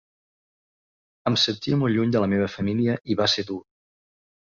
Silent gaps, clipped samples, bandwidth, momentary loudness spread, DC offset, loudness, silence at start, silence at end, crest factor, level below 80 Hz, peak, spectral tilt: none; under 0.1%; 7.4 kHz; 6 LU; under 0.1%; -23 LUFS; 1.25 s; 1 s; 16 dB; -56 dBFS; -8 dBFS; -5.5 dB/octave